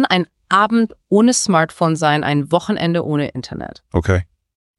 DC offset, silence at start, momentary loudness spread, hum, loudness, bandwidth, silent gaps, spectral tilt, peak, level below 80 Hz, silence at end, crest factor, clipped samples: under 0.1%; 0 s; 11 LU; none; -17 LUFS; 12 kHz; none; -5 dB/octave; -2 dBFS; -40 dBFS; 0.55 s; 16 dB; under 0.1%